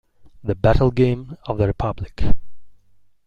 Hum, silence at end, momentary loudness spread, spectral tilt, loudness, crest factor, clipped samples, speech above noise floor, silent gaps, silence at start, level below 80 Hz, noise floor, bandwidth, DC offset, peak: 50 Hz at -40 dBFS; 0.55 s; 12 LU; -9 dB/octave; -21 LUFS; 18 dB; under 0.1%; 37 dB; none; 0.4 s; -30 dBFS; -53 dBFS; 5.6 kHz; under 0.1%; -2 dBFS